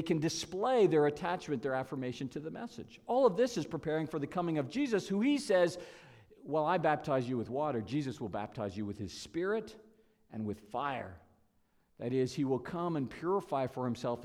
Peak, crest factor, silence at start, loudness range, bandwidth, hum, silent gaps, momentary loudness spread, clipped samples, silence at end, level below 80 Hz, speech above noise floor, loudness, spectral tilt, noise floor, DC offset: -14 dBFS; 20 dB; 0 s; 7 LU; 14.5 kHz; none; none; 13 LU; under 0.1%; 0 s; -68 dBFS; 38 dB; -34 LUFS; -6 dB/octave; -72 dBFS; under 0.1%